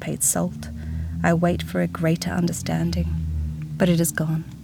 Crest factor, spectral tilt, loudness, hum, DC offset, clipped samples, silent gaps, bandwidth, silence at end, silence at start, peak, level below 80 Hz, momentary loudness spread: 18 dB; -5 dB/octave; -23 LUFS; none; under 0.1%; under 0.1%; none; 19.5 kHz; 0 s; 0 s; -6 dBFS; -38 dBFS; 10 LU